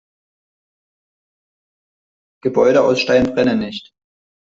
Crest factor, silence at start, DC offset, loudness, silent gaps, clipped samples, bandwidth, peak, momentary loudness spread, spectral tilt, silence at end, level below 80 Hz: 18 dB; 2.45 s; under 0.1%; -16 LUFS; none; under 0.1%; 7.6 kHz; -2 dBFS; 13 LU; -5.5 dB/octave; 0.65 s; -52 dBFS